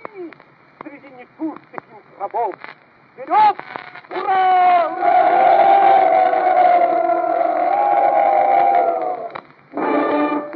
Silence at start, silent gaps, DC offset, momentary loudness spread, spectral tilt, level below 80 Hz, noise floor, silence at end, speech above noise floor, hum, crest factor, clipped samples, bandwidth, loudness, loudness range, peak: 0.15 s; none; under 0.1%; 21 LU; -7.5 dB/octave; -72 dBFS; -46 dBFS; 0 s; 28 dB; none; 14 dB; under 0.1%; 4.9 kHz; -15 LUFS; 9 LU; -2 dBFS